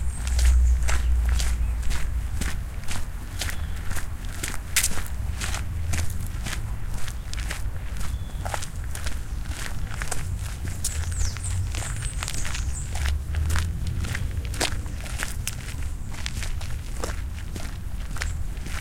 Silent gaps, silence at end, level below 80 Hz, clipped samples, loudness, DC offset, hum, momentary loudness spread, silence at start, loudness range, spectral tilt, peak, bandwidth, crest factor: none; 0 s; -28 dBFS; under 0.1%; -29 LUFS; under 0.1%; none; 9 LU; 0 s; 4 LU; -3.5 dB/octave; -4 dBFS; 17 kHz; 20 dB